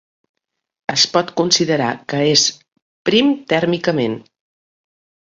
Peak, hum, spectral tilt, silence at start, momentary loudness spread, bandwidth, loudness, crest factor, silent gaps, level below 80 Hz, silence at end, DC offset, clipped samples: 0 dBFS; none; -3.5 dB/octave; 0.9 s; 8 LU; 7.8 kHz; -16 LUFS; 20 dB; 2.82-3.05 s; -60 dBFS; 1.2 s; under 0.1%; under 0.1%